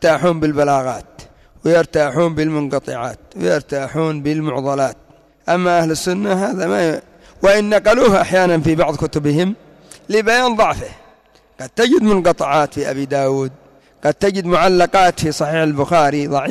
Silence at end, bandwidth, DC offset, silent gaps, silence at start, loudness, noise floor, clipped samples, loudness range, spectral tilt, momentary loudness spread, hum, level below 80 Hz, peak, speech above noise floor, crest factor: 0 s; 14.5 kHz; under 0.1%; none; 0 s; -16 LUFS; -51 dBFS; under 0.1%; 4 LU; -5.5 dB/octave; 10 LU; none; -44 dBFS; -4 dBFS; 35 dB; 12 dB